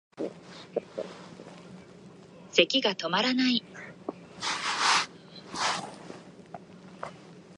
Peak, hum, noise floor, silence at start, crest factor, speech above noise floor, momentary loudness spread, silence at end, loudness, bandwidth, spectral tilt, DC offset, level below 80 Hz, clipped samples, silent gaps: -4 dBFS; none; -50 dBFS; 0.15 s; 28 dB; 25 dB; 23 LU; 0.05 s; -28 LUFS; 11.5 kHz; -2.5 dB/octave; under 0.1%; -74 dBFS; under 0.1%; none